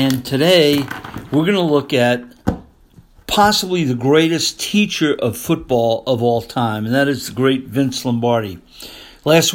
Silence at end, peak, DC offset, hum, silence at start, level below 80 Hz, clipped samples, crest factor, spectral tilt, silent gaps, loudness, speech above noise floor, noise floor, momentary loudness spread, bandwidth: 0 s; 0 dBFS; under 0.1%; none; 0 s; -44 dBFS; under 0.1%; 16 dB; -4.5 dB/octave; none; -16 LUFS; 31 dB; -47 dBFS; 12 LU; 17 kHz